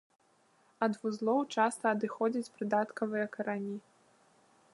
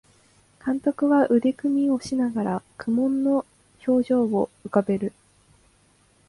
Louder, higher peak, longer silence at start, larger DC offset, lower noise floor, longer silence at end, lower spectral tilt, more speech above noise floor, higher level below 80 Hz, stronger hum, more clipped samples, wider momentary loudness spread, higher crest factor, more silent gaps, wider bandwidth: second, -33 LUFS vs -24 LUFS; second, -14 dBFS vs -6 dBFS; first, 0.8 s vs 0.65 s; neither; first, -69 dBFS vs -60 dBFS; second, 0.95 s vs 1.2 s; second, -5.5 dB/octave vs -7.5 dB/octave; about the same, 36 dB vs 38 dB; second, -86 dBFS vs -62 dBFS; second, none vs 50 Hz at -60 dBFS; neither; about the same, 7 LU vs 9 LU; about the same, 20 dB vs 18 dB; neither; about the same, 11.5 kHz vs 11.5 kHz